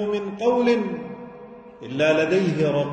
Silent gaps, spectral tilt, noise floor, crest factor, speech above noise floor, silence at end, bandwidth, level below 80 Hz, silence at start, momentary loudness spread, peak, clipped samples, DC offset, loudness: none; -6.5 dB/octave; -42 dBFS; 14 dB; 21 dB; 0 s; 9 kHz; -60 dBFS; 0 s; 20 LU; -8 dBFS; under 0.1%; under 0.1%; -21 LUFS